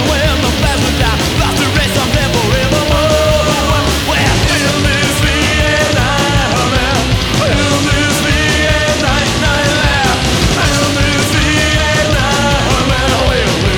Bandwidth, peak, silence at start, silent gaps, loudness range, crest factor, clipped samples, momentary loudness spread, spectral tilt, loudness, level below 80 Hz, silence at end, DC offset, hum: over 20 kHz; 0 dBFS; 0 s; none; 1 LU; 10 dB; under 0.1%; 2 LU; -4 dB/octave; -11 LUFS; -20 dBFS; 0 s; under 0.1%; none